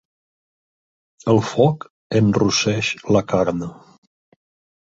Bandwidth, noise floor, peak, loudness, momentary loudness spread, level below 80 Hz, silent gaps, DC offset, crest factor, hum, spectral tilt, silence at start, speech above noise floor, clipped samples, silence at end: 7.8 kHz; under -90 dBFS; -2 dBFS; -19 LUFS; 12 LU; -50 dBFS; 1.90-2.10 s; under 0.1%; 20 dB; none; -5.5 dB/octave; 1.25 s; over 72 dB; under 0.1%; 1.15 s